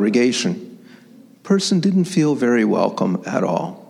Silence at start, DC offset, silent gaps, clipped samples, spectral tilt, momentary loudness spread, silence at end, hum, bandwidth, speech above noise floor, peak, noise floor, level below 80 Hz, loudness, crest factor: 0 s; under 0.1%; none; under 0.1%; -5.5 dB/octave; 6 LU; 0.05 s; none; 12 kHz; 28 dB; -2 dBFS; -46 dBFS; -70 dBFS; -18 LUFS; 16 dB